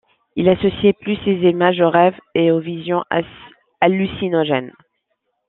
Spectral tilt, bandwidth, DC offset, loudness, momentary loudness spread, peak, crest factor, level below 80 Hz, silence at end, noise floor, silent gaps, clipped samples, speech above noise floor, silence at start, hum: -10 dB/octave; 4.1 kHz; under 0.1%; -17 LUFS; 8 LU; -2 dBFS; 16 dB; -52 dBFS; 0.8 s; -72 dBFS; none; under 0.1%; 55 dB; 0.35 s; none